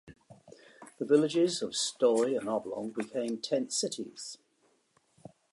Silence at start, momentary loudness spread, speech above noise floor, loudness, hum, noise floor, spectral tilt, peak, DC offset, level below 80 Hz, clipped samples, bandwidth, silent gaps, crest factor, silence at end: 0.05 s; 15 LU; 41 dB; -31 LUFS; none; -71 dBFS; -3.5 dB/octave; -12 dBFS; under 0.1%; -76 dBFS; under 0.1%; 11.5 kHz; none; 20 dB; 1.15 s